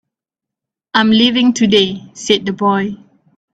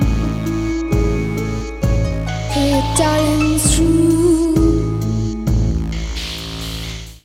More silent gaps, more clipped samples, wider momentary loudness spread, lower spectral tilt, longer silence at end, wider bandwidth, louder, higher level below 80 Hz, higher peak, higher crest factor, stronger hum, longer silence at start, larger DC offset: neither; neither; about the same, 12 LU vs 11 LU; about the same, -4.5 dB/octave vs -5.5 dB/octave; first, 0.55 s vs 0.1 s; second, 8.4 kHz vs 16 kHz; first, -13 LUFS vs -17 LUFS; second, -56 dBFS vs -24 dBFS; about the same, 0 dBFS vs 0 dBFS; about the same, 16 dB vs 16 dB; neither; first, 0.95 s vs 0 s; neither